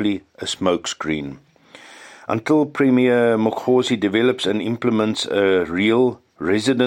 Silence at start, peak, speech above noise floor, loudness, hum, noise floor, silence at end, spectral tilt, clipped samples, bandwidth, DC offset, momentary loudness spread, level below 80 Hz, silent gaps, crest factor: 0 s; -4 dBFS; 26 dB; -19 LUFS; none; -45 dBFS; 0 s; -5 dB/octave; under 0.1%; 12.5 kHz; under 0.1%; 10 LU; -58 dBFS; none; 16 dB